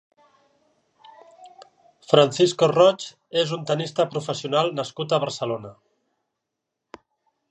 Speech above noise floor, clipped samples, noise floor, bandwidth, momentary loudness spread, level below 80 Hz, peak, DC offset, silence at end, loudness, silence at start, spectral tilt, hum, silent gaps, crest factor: 61 dB; under 0.1%; -82 dBFS; 9 kHz; 12 LU; -72 dBFS; -2 dBFS; under 0.1%; 1.8 s; -22 LUFS; 1.4 s; -5 dB/octave; none; none; 22 dB